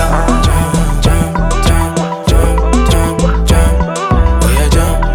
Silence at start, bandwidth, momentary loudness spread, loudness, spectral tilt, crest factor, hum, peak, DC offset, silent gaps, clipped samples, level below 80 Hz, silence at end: 0 s; 17.5 kHz; 3 LU; -12 LUFS; -5.5 dB/octave; 10 dB; none; 0 dBFS; under 0.1%; none; under 0.1%; -12 dBFS; 0 s